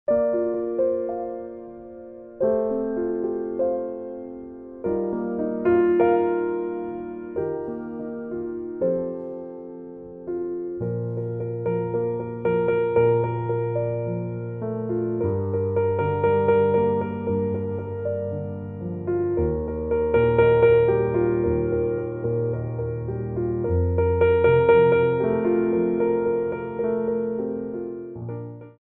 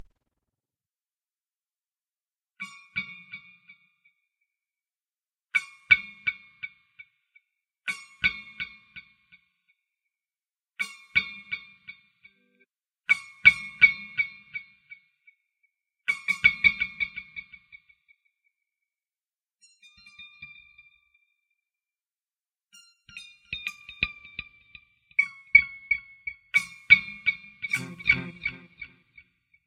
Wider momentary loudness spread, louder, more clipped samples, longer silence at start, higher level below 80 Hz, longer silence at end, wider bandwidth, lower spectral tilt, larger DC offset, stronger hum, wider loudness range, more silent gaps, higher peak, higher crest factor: second, 15 LU vs 26 LU; about the same, -24 LUFS vs -24 LUFS; neither; second, 0.1 s vs 2.6 s; first, -44 dBFS vs -60 dBFS; second, 0.1 s vs 0.8 s; second, 4 kHz vs 15.5 kHz; first, -11.5 dB/octave vs -2 dB/octave; neither; neither; second, 9 LU vs 19 LU; neither; second, -6 dBFS vs -2 dBFS; second, 18 dB vs 30 dB